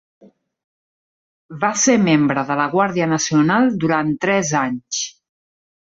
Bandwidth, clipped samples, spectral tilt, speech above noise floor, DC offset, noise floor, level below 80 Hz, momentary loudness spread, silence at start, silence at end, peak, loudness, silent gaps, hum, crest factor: 7.8 kHz; under 0.1%; -4.5 dB/octave; over 73 dB; under 0.1%; under -90 dBFS; -60 dBFS; 8 LU; 1.5 s; 0.75 s; -2 dBFS; -17 LUFS; none; none; 16 dB